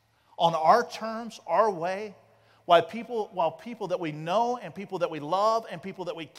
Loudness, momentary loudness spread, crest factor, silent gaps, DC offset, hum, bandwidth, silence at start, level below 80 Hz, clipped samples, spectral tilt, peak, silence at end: -27 LUFS; 14 LU; 22 dB; none; under 0.1%; none; 13.5 kHz; 0.4 s; -78 dBFS; under 0.1%; -5 dB/octave; -6 dBFS; 0 s